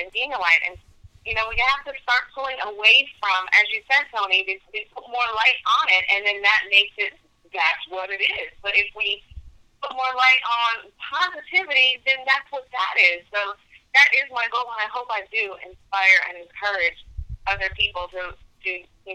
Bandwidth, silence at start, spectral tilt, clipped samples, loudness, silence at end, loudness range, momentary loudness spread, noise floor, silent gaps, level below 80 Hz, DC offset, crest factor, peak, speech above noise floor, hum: 15.5 kHz; 0 s; -1 dB/octave; under 0.1%; -20 LUFS; 0 s; 3 LU; 15 LU; -43 dBFS; none; -48 dBFS; under 0.1%; 20 dB; -2 dBFS; 21 dB; none